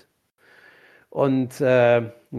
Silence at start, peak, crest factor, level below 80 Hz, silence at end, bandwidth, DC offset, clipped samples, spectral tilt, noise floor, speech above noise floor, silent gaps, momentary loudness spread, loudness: 1.15 s; -6 dBFS; 16 dB; -66 dBFS; 0 s; 13.5 kHz; under 0.1%; under 0.1%; -7 dB/octave; -61 dBFS; 41 dB; none; 7 LU; -20 LUFS